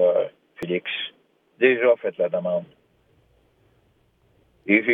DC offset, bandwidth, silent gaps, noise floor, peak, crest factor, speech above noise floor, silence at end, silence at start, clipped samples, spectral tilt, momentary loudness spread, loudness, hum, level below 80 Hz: under 0.1%; 4.2 kHz; none; -63 dBFS; -2 dBFS; 22 dB; 43 dB; 0 s; 0 s; under 0.1%; -7 dB/octave; 14 LU; -23 LUFS; none; -70 dBFS